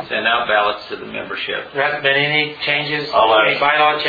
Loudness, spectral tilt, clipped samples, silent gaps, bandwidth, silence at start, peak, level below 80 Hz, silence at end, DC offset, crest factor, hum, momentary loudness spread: -16 LUFS; -5.5 dB/octave; under 0.1%; none; 4.9 kHz; 0 s; -2 dBFS; -56 dBFS; 0 s; under 0.1%; 16 dB; none; 12 LU